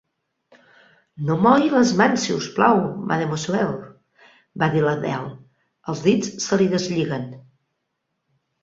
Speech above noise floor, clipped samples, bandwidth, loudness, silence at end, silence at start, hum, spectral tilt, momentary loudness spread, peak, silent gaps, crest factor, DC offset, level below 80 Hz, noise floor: 57 dB; under 0.1%; 7.8 kHz; -20 LUFS; 1.2 s; 1.15 s; none; -5.5 dB/octave; 14 LU; -2 dBFS; none; 20 dB; under 0.1%; -60 dBFS; -76 dBFS